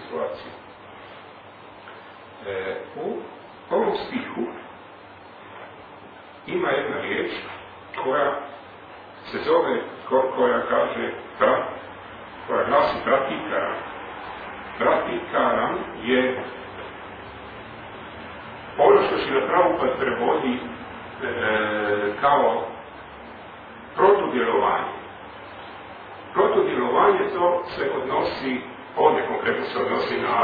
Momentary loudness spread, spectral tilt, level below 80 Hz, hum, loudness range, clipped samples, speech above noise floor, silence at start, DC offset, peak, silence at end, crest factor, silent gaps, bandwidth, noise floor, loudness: 22 LU; -7.5 dB/octave; -58 dBFS; none; 8 LU; under 0.1%; 22 dB; 0 s; under 0.1%; -4 dBFS; 0 s; 22 dB; none; 5 kHz; -44 dBFS; -23 LUFS